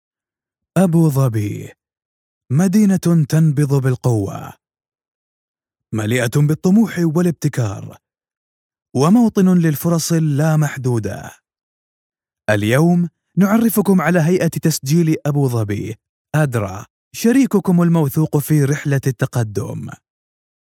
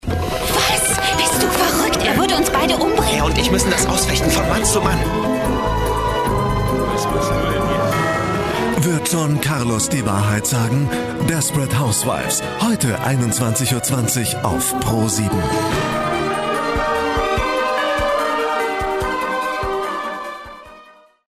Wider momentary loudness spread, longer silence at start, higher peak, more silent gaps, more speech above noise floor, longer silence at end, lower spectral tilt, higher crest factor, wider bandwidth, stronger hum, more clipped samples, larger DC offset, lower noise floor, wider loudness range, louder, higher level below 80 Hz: first, 12 LU vs 5 LU; first, 0.75 s vs 0.05 s; about the same, -2 dBFS vs 0 dBFS; first, 2.05-2.41 s, 5.08-5.54 s, 8.37-8.70 s, 11.63-12.10 s, 16.09-16.25 s, 16.90-17.11 s vs none; first, over 75 dB vs 29 dB; first, 0.8 s vs 0.45 s; first, -7 dB/octave vs -4 dB/octave; about the same, 14 dB vs 18 dB; first, 17.5 kHz vs 14 kHz; neither; neither; neither; first, under -90 dBFS vs -46 dBFS; about the same, 3 LU vs 3 LU; about the same, -16 LUFS vs -18 LUFS; second, -56 dBFS vs -32 dBFS